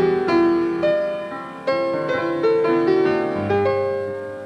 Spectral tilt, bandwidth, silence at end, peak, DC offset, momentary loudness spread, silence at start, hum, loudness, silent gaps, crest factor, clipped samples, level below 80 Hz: -7.5 dB/octave; 8.8 kHz; 0 s; -6 dBFS; under 0.1%; 9 LU; 0 s; none; -20 LUFS; none; 12 dB; under 0.1%; -60 dBFS